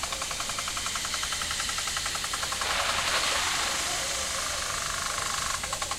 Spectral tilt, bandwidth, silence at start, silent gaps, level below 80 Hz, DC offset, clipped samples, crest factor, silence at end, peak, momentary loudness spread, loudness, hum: 0 dB/octave; 16 kHz; 0 s; none; -48 dBFS; under 0.1%; under 0.1%; 18 dB; 0 s; -12 dBFS; 4 LU; -28 LUFS; none